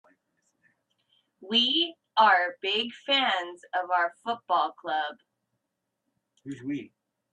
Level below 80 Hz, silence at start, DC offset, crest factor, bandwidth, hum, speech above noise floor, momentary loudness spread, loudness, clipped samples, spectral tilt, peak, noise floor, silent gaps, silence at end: -80 dBFS; 1.4 s; under 0.1%; 20 dB; 10 kHz; none; 56 dB; 14 LU; -26 LUFS; under 0.1%; -3.5 dB/octave; -8 dBFS; -83 dBFS; none; 0.45 s